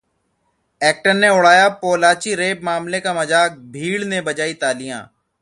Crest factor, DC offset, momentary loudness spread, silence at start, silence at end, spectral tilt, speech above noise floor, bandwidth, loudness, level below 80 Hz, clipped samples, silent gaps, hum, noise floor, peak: 18 dB; under 0.1%; 12 LU; 0.8 s; 0.35 s; -3 dB/octave; 50 dB; 11.5 kHz; -16 LUFS; -62 dBFS; under 0.1%; none; none; -67 dBFS; 0 dBFS